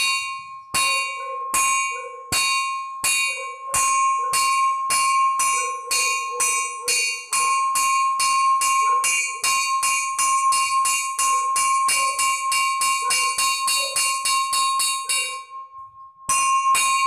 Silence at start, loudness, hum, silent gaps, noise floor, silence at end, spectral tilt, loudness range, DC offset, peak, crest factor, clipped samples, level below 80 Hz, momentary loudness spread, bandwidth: 0 s; -20 LUFS; none; none; -42 dBFS; 0 s; 2.5 dB/octave; 2 LU; under 0.1%; -10 dBFS; 12 dB; under 0.1%; -62 dBFS; 6 LU; 14.5 kHz